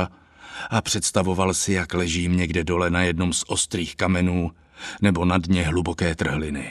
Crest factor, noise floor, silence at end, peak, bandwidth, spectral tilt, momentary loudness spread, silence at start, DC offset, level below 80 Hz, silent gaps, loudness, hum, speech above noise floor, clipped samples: 20 dB; -44 dBFS; 0 s; -4 dBFS; 13.5 kHz; -4.5 dB/octave; 6 LU; 0 s; under 0.1%; -40 dBFS; none; -23 LUFS; none; 21 dB; under 0.1%